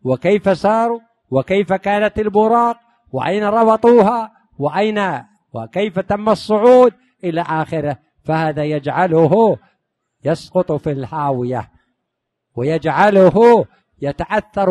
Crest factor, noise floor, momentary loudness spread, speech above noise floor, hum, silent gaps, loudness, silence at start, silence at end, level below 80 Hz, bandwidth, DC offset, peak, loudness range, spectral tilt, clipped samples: 16 dB; -76 dBFS; 15 LU; 61 dB; none; none; -16 LUFS; 0.05 s; 0 s; -48 dBFS; 11 kHz; under 0.1%; 0 dBFS; 3 LU; -7.5 dB/octave; under 0.1%